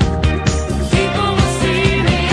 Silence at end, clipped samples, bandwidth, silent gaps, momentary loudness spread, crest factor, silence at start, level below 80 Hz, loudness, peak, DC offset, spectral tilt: 0 s; under 0.1%; 12.5 kHz; none; 4 LU; 14 dB; 0 s; -22 dBFS; -16 LUFS; 0 dBFS; under 0.1%; -5.5 dB/octave